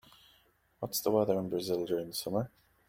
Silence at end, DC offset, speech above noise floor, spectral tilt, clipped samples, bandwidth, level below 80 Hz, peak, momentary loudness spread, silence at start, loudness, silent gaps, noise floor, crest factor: 0.4 s; under 0.1%; 36 dB; -5 dB/octave; under 0.1%; 16.5 kHz; -70 dBFS; -14 dBFS; 8 LU; 0.8 s; -33 LUFS; none; -68 dBFS; 20 dB